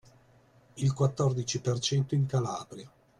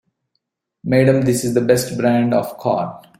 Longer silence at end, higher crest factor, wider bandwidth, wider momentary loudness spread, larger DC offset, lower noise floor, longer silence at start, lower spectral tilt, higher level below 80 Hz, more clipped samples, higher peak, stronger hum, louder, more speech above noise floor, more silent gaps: about the same, 0.3 s vs 0.25 s; about the same, 18 dB vs 16 dB; second, 11 kHz vs 16.5 kHz; first, 11 LU vs 6 LU; neither; second, -61 dBFS vs -73 dBFS; about the same, 0.75 s vs 0.85 s; about the same, -5.5 dB/octave vs -6 dB/octave; second, -62 dBFS vs -54 dBFS; neither; second, -14 dBFS vs -2 dBFS; neither; second, -30 LUFS vs -17 LUFS; second, 32 dB vs 57 dB; neither